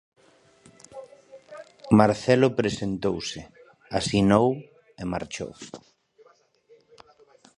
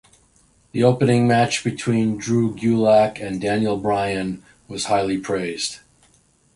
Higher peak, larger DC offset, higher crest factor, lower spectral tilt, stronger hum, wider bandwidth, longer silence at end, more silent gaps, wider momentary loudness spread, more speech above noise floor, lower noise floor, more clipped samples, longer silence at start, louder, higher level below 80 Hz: about the same, -2 dBFS vs -2 dBFS; neither; first, 24 dB vs 18 dB; about the same, -6 dB/octave vs -5.5 dB/octave; neither; about the same, 11 kHz vs 11.5 kHz; first, 1.8 s vs 0.8 s; neither; first, 25 LU vs 12 LU; about the same, 36 dB vs 39 dB; about the same, -59 dBFS vs -58 dBFS; neither; first, 0.95 s vs 0.75 s; second, -24 LUFS vs -20 LUFS; about the same, -52 dBFS vs -52 dBFS